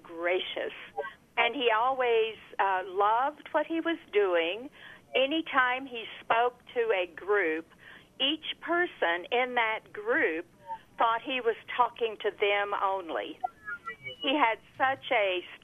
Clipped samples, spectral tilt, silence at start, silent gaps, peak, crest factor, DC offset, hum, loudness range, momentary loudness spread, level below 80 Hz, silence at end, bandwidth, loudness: under 0.1%; -4.5 dB/octave; 0.05 s; none; -10 dBFS; 20 dB; under 0.1%; none; 2 LU; 12 LU; -72 dBFS; 0.05 s; 12.5 kHz; -29 LUFS